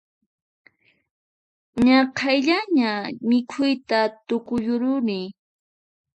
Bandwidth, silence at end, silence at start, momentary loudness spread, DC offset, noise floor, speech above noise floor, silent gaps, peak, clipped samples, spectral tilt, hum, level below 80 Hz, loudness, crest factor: 8.4 kHz; 0.85 s; 1.75 s; 10 LU; under 0.1%; under -90 dBFS; over 69 dB; none; -6 dBFS; under 0.1%; -5 dB/octave; none; -58 dBFS; -22 LUFS; 18 dB